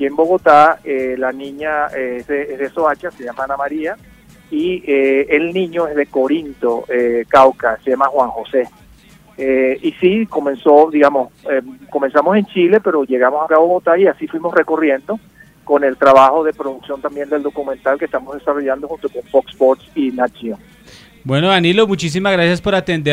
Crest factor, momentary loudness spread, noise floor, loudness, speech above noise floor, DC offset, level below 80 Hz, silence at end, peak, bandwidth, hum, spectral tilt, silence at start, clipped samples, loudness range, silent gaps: 14 dB; 13 LU; -45 dBFS; -15 LUFS; 30 dB; under 0.1%; -50 dBFS; 0 s; 0 dBFS; 15 kHz; none; -6 dB/octave; 0 s; under 0.1%; 5 LU; none